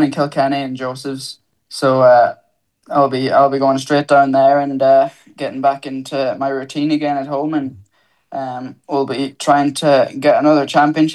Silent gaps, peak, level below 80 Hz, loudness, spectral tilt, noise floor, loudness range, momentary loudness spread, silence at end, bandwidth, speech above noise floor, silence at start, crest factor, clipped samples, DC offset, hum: none; -2 dBFS; -68 dBFS; -15 LUFS; -5.5 dB/octave; -57 dBFS; 7 LU; 14 LU; 0 s; 12.5 kHz; 42 dB; 0 s; 14 dB; under 0.1%; under 0.1%; none